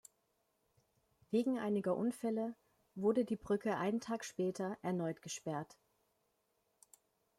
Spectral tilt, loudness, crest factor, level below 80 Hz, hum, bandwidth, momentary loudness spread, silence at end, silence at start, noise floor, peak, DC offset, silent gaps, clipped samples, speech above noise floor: -6 dB/octave; -38 LUFS; 18 dB; -78 dBFS; none; 15 kHz; 9 LU; 1.75 s; 1.3 s; -81 dBFS; -22 dBFS; under 0.1%; none; under 0.1%; 43 dB